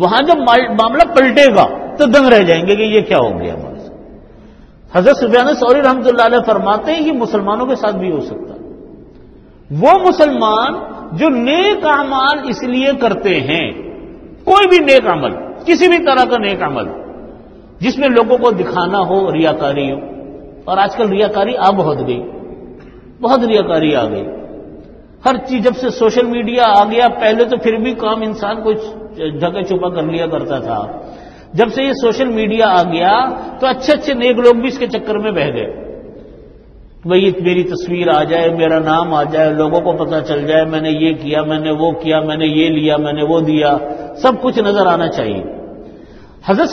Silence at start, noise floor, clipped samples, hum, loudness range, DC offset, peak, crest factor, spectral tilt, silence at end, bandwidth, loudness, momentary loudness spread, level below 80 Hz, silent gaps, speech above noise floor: 0 s; -39 dBFS; 0.2%; none; 5 LU; under 0.1%; 0 dBFS; 14 dB; -6 dB/octave; 0 s; 9.4 kHz; -13 LUFS; 15 LU; -44 dBFS; none; 27 dB